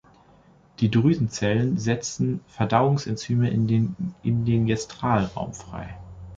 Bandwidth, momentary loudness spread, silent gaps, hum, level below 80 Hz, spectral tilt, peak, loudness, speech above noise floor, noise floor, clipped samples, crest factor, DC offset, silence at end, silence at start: 7.8 kHz; 13 LU; none; none; -50 dBFS; -6.5 dB/octave; -4 dBFS; -24 LUFS; 32 dB; -55 dBFS; under 0.1%; 20 dB; under 0.1%; 0 s; 0.8 s